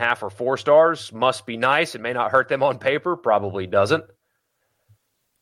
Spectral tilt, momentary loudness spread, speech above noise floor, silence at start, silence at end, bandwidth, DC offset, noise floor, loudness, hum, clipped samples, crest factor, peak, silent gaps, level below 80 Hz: -5 dB/octave; 8 LU; 52 dB; 0 s; 1.4 s; 12.5 kHz; under 0.1%; -73 dBFS; -21 LUFS; none; under 0.1%; 18 dB; -4 dBFS; none; -68 dBFS